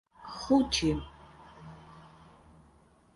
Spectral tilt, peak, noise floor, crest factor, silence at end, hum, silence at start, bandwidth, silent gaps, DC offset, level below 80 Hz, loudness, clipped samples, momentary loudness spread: -4.5 dB/octave; -14 dBFS; -62 dBFS; 20 dB; 1.1 s; none; 0.2 s; 11.5 kHz; none; under 0.1%; -50 dBFS; -29 LUFS; under 0.1%; 27 LU